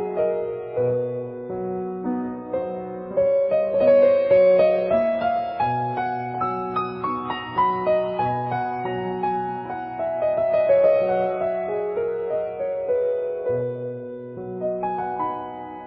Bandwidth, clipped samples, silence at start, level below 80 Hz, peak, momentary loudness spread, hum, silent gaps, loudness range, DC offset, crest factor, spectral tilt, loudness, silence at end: 5.4 kHz; under 0.1%; 0 s; -56 dBFS; -6 dBFS; 12 LU; none; none; 7 LU; under 0.1%; 16 dB; -11 dB/octave; -23 LUFS; 0 s